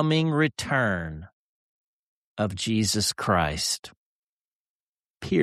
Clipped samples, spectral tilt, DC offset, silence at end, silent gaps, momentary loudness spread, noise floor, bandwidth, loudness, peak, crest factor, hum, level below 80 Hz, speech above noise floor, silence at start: under 0.1%; -4 dB/octave; under 0.1%; 0 s; 1.33-2.36 s, 3.79-3.83 s, 3.96-5.15 s; 14 LU; under -90 dBFS; 14 kHz; -25 LUFS; -8 dBFS; 20 dB; none; -50 dBFS; over 65 dB; 0 s